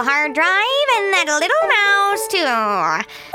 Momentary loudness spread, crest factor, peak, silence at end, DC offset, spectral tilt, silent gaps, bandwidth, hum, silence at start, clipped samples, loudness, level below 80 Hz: 4 LU; 14 dB; -4 dBFS; 0 s; under 0.1%; -1 dB/octave; none; 17 kHz; none; 0 s; under 0.1%; -16 LUFS; -64 dBFS